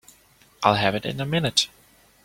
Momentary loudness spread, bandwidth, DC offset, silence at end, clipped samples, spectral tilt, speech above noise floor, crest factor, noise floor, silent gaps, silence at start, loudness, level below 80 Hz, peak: 7 LU; 16.5 kHz; under 0.1%; 0.6 s; under 0.1%; -4 dB/octave; 34 dB; 24 dB; -57 dBFS; none; 0.6 s; -23 LUFS; -56 dBFS; -2 dBFS